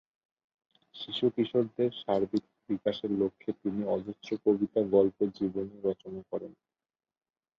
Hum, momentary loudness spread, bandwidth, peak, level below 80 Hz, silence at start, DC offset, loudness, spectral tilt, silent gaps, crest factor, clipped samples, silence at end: none; 12 LU; 6.8 kHz; -12 dBFS; -68 dBFS; 0.95 s; under 0.1%; -31 LUFS; -8 dB/octave; none; 20 dB; under 0.1%; 1.05 s